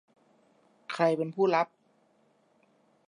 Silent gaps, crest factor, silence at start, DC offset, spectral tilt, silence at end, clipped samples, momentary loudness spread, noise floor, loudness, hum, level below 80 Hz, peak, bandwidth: none; 20 dB; 0.9 s; under 0.1%; -6.5 dB/octave; 1.45 s; under 0.1%; 13 LU; -68 dBFS; -29 LUFS; none; -88 dBFS; -12 dBFS; 11 kHz